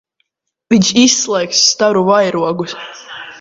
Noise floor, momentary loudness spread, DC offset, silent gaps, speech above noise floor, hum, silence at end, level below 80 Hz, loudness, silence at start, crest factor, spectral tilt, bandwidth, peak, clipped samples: -67 dBFS; 18 LU; under 0.1%; none; 54 dB; none; 0 s; -56 dBFS; -12 LUFS; 0.7 s; 14 dB; -3 dB/octave; 7.8 kHz; 0 dBFS; under 0.1%